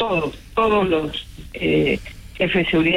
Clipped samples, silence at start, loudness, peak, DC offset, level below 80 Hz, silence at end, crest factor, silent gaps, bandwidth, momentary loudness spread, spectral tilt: under 0.1%; 0 s; -20 LUFS; -8 dBFS; under 0.1%; -40 dBFS; 0 s; 12 dB; none; 15 kHz; 12 LU; -6.5 dB/octave